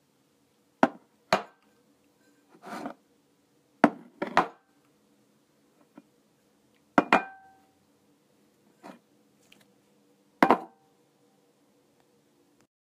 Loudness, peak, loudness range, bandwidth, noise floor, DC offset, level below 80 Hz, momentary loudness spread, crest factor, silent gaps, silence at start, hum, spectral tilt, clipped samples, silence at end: -28 LUFS; -2 dBFS; 2 LU; 15.5 kHz; -68 dBFS; under 0.1%; -72 dBFS; 27 LU; 30 dB; none; 0.85 s; none; -5 dB/octave; under 0.1%; 2.2 s